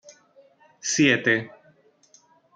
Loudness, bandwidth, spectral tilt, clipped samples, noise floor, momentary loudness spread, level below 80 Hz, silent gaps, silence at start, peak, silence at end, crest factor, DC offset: -22 LUFS; 9.4 kHz; -3 dB/octave; under 0.1%; -59 dBFS; 15 LU; -68 dBFS; none; 0.85 s; -6 dBFS; 1.1 s; 20 dB; under 0.1%